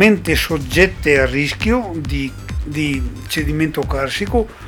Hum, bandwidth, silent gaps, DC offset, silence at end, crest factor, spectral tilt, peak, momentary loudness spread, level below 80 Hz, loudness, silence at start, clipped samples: none; 19.5 kHz; none; under 0.1%; 0 s; 18 dB; -5 dB/octave; 0 dBFS; 10 LU; -28 dBFS; -18 LUFS; 0 s; under 0.1%